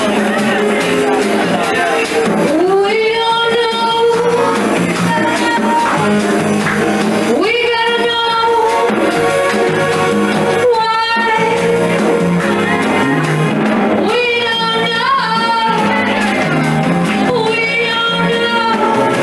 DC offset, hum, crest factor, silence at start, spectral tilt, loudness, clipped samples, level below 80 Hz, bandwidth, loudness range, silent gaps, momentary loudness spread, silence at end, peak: under 0.1%; none; 12 dB; 0 s; -5 dB/octave; -13 LUFS; under 0.1%; -48 dBFS; 13 kHz; 0 LU; none; 1 LU; 0 s; 0 dBFS